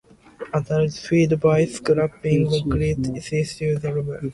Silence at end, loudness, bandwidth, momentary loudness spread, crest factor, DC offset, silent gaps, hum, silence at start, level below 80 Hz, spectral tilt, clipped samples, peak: 0 s; -22 LUFS; 11.5 kHz; 8 LU; 16 dB; under 0.1%; none; none; 0.4 s; -42 dBFS; -7 dB/octave; under 0.1%; -6 dBFS